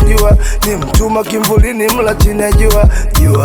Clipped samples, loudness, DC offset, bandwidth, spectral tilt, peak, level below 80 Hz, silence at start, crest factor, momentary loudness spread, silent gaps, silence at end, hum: 0.1%; -11 LUFS; under 0.1%; 19.5 kHz; -5.5 dB/octave; 0 dBFS; -12 dBFS; 0 s; 8 dB; 4 LU; none; 0 s; none